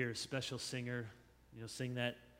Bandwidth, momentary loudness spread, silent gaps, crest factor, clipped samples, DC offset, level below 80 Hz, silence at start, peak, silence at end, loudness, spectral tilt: 16 kHz; 13 LU; none; 22 dB; under 0.1%; under 0.1%; -72 dBFS; 0 s; -22 dBFS; 0 s; -42 LUFS; -4 dB/octave